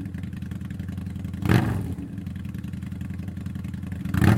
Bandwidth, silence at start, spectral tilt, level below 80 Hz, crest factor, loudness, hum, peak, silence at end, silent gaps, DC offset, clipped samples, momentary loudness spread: 16.5 kHz; 0 s; -7.5 dB/octave; -42 dBFS; 22 dB; -29 LUFS; none; -4 dBFS; 0 s; none; under 0.1%; under 0.1%; 12 LU